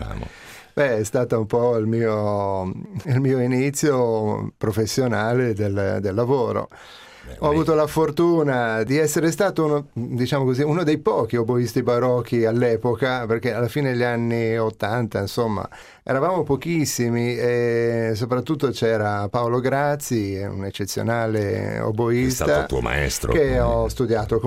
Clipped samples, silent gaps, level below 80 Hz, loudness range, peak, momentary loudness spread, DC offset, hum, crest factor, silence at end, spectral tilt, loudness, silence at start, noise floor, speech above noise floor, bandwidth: under 0.1%; none; -40 dBFS; 2 LU; -8 dBFS; 6 LU; under 0.1%; none; 14 dB; 0 s; -6 dB/octave; -21 LUFS; 0 s; -41 dBFS; 21 dB; 16 kHz